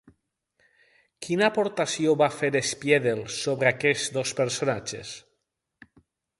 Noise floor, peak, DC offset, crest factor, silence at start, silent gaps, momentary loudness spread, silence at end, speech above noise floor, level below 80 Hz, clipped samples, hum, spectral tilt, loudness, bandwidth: -78 dBFS; -6 dBFS; under 0.1%; 22 dB; 1.2 s; none; 12 LU; 1.2 s; 53 dB; -66 dBFS; under 0.1%; none; -4 dB/octave; -25 LUFS; 11.5 kHz